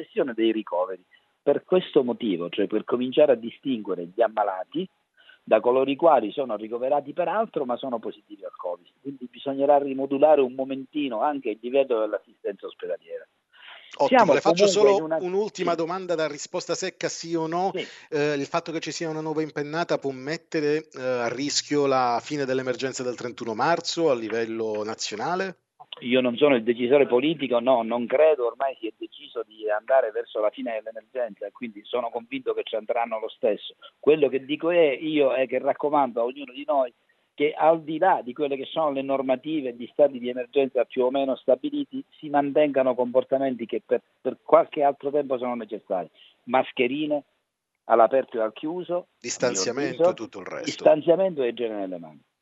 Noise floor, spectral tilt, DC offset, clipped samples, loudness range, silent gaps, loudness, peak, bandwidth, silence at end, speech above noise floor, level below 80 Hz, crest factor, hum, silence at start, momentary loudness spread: -79 dBFS; -4.5 dB/octave; under 0.1%; under 0.1%; 5 LU; none; -25 LUFS; -2 dBFS; 8.2 kHz; 0.3 s; 54 dB; -80 dBFS; 22 dB; none; 0 s; 13 LU